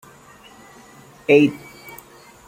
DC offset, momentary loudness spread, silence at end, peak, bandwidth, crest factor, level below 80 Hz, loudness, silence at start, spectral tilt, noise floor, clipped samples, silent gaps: under 0.1%; 25 LU; 0.9 s; -2 dBFS; 16.5 kHz; 22 dB; -62 dBFS; -17 LUFS; 1.3 s; -6 dB/octave; -46 dBFS; under 0.1%; none